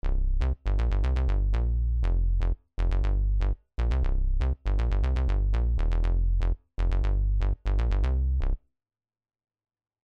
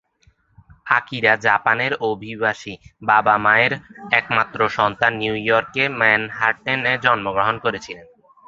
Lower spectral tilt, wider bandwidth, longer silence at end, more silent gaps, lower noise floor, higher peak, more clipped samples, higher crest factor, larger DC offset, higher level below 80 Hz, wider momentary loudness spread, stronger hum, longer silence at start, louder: first, -8 dB/octave vs -5 dB/octave; second, 5.2 kHz vs 7.8 kHz; first, 1.5 s vs 0.45 s; neither; first, under -90 dBFS vs -59 dBFS; second, -16 dBFS vs -2 dBFS; neither; second, 8 dB vs 18 dB; neither; first, -26 dBFS vs -56 dBFS; second, 4 LU vs 9 LU; neither; second, 0.05 s vs 0.85 s; second, -29 LUFS vs -18 LUFS